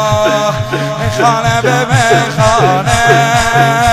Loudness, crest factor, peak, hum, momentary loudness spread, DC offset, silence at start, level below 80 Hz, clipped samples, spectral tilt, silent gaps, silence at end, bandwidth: -10 LUFS; 10 dB; 0 dBFS; none; 6 LU; under 0.1%; 0 s; -32 dBFS; 0.2%; -4.5 dB/octave; none; 0 s; 15.5 kHz